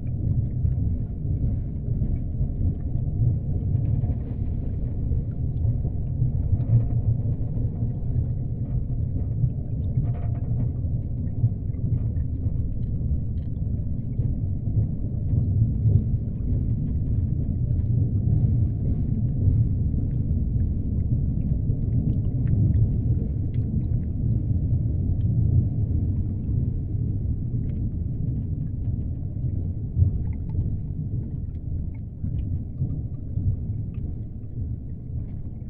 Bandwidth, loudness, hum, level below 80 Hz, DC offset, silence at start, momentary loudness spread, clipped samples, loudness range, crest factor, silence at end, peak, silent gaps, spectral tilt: 2.1 kHz; -26 LUFS; none; -30 dBFS; under 0.1%; 0 s; 7 LU; under 0.1%; 4 LU; 16 dB; 0 s; -8 dBFS; none; -14.5 dB/octave